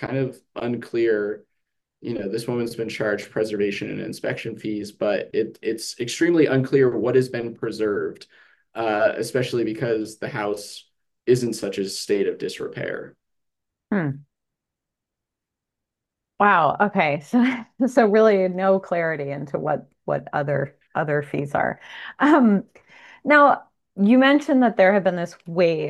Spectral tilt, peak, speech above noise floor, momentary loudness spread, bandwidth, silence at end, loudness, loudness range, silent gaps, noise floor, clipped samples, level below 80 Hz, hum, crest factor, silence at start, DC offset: -6 dB/octave; -2 dBFS; 64 dB; 13 LU; 12.5 kHz; 0 s; -22 LUFS; 8 LU; none; -85 dBFS; under 0.1%; -66 dBFS; none; 20 dB; 0 s; under 0.1%